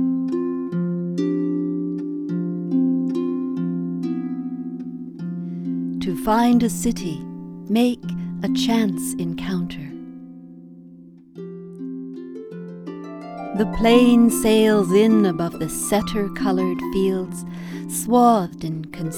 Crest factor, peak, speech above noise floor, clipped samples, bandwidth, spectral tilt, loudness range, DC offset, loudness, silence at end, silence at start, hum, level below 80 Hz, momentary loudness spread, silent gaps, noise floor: 20 dB; -2 dBFS; 25 dB; under 0.1%; 17.5 kHz; -5.5 dB/octave; 14 LU; under 0.1%; -21 LUFS; 0 s; 0 s; none; -46 dBFS; 18 LU; none; -44 dBFS